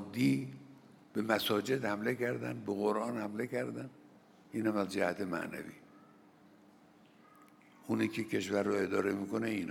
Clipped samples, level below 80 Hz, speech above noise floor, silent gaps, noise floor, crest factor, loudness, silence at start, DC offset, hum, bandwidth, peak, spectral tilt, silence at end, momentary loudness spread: under 0.1%; -82 dBFS; 28 dB; none; -62 dBFS; 24 dB; -35 LUFS; 0 s; under 0.1%; none; 19.5 kHz; -12 dBFS; -5.5 dB/octave; 0 s; 11 LU